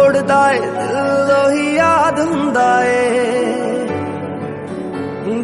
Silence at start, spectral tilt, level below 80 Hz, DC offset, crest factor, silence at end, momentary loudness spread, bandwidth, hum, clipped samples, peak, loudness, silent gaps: 0 s; -5 dB/octave; -56 dBFS; under 0.1%; 14 dB; 0 s; 11 LU; 11.5 kHz; none; under 0.1%; 0 dBFS; -15 LUFS; none